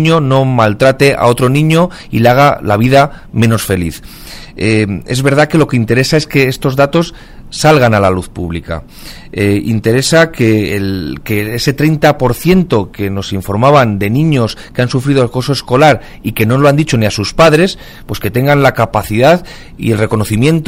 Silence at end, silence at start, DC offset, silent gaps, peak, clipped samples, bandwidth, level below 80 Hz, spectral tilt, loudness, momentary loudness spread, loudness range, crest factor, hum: 0 s; 0 s; under 0.1%; none; 0 dBFS; 0.3%; 16.5 kHz; -34 dBFS; -6 dB/octave; -11 LUFS; 11 LU; 3 LU; 10 dB; none